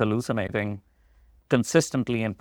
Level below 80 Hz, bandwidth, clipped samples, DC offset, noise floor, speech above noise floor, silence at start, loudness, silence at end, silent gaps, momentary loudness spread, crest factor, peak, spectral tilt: -56 dBFS; 18 kHz; under 0.1%; under 0.1%; -58 dBFS; 33 dB; 0 s; -26 LUFS; 0.05 s; none; 9 LU; 20 dB; -6 dBFS; -5.5 dB/octave